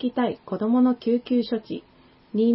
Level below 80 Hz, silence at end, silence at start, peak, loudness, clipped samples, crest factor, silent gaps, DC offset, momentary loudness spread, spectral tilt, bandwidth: -64 dBFS; 0 s; 0 s; -10 dBFS; -24 LUFS; under 0.1%; 14 dB; none; under 0.1%; 11 LU; -11 dB/octave; 5.8 kHz